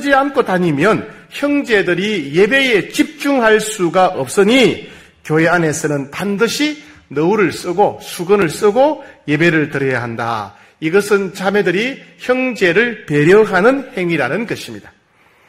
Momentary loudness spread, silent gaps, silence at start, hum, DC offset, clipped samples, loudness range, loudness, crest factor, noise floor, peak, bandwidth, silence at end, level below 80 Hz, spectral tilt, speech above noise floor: 10 LU; none; 0 s; none; under 0.1%; under 0.1%; 3 LU; -14 LUFS; 14 dB; -52 dBFS; 0 dBFS; 16 kHz; 0.6 s; -52 dBFS; -5 dB/octave; 38 dB